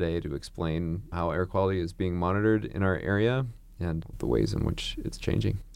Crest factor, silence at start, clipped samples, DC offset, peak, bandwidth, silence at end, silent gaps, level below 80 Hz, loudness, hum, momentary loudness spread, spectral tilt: 16 dB; 0 s; under 0.1%; under 0.1%; -12 dBFS; 14.5 kHz; 0 s; none; -42 dBFS; -29 LUFS; none; 8 LU; -7 dB/octave